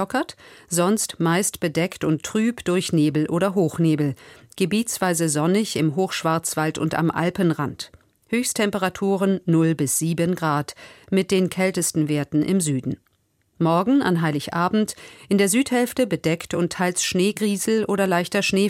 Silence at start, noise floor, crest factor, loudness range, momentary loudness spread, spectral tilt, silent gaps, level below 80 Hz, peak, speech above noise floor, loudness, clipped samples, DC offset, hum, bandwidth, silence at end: 0 s; -66 dBFS; 14 dB; 2 LU; 6 LU; -5 dB/octave; none; -58 dBFS; -6 dBFS; 45 dB; -22 LUFS; under 0.1%; under 0.1%; none; 16.5 kHz; 0 s